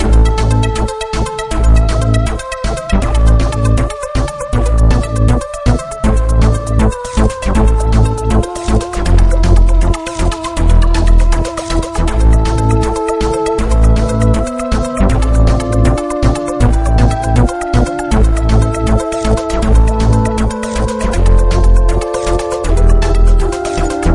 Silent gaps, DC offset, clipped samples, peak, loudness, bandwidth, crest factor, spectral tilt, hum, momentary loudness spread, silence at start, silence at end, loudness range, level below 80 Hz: none; under 0.1%; under 0.1%; 0 dBFS; -14 LUFS; 11.5 kHz; 10 dB; -6.5 dB/octave; none; 5 LU; 0 s; 0 s; 1 LU; -12 dBFS